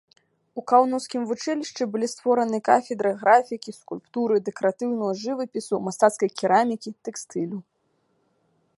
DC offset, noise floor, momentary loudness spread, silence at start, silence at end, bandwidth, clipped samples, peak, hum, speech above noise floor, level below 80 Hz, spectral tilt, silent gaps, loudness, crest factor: under 0.1%; -69 dBFS; 15 LU; 0.55 s; 1.15 s; 11.5 kHz; under 0.1%; -4 dBFS; none; 46 dB; -78 dBFS; -4.5 dB/octave; none; -24 LUFS; 20 dB